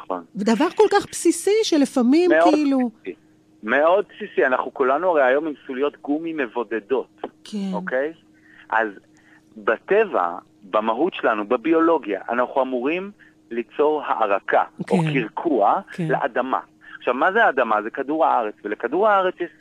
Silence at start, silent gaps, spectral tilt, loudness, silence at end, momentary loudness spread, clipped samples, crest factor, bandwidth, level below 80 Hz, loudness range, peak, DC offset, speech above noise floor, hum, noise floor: 0 s; none; -5 dB/octave; -21 LUFS; 0.1 s; 10 LU; under 0.1%; 20 dB; 14.5 kHz; -68 dBFS; 6 LU; -2 dBFS; under 0.1%; 32 dB; none; -53 dBFS